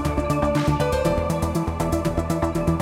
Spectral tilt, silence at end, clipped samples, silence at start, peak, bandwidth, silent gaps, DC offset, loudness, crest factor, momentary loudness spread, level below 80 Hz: -6.5 dB/octave; 0 s; under 0.1%; 0 s; -8 dBFS; 17 kHz; none; under 0.1%; -23 LUFS; 14 dB; 3 LU; -32 dBFS